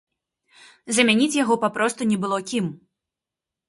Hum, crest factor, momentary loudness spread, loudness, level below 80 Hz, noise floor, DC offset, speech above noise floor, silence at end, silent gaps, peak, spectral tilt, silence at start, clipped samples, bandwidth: none; 20 dB; 9 LU; -21 LUFS; -68 dBFS; -87 dBFS; under 0.1%; 66 dB; 0.9 s; none; -2 dBFS; -3.5 dB/octave; 0.85 s; under 0.1%; 11.5 kHz